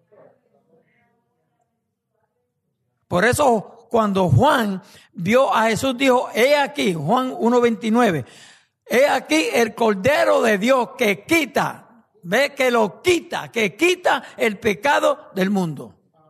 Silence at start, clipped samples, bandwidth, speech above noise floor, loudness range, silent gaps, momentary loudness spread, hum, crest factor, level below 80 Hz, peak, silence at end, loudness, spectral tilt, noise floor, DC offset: 3.1 s; under 0.1%; 13.5 kHz; 56 dB; 3 LU; none; 7 LU; none; 14 dB; -52 dBFS; -6 dBFS; 0.4 s; -19 LUFS; -5 dB/octave; -75 dBFS; under 0.1%